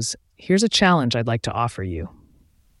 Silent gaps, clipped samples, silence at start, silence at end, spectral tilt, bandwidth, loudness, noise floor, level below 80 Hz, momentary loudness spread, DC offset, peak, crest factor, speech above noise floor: none; under 0.1%; 0 s; 0.7 s; -4.5 dB/octave; 12 kHz; -20 LUFS; -57 dBFS; -46 dBFS; 17 LU; under 0.1%; -4 dBFS; 18 dB; 36 dB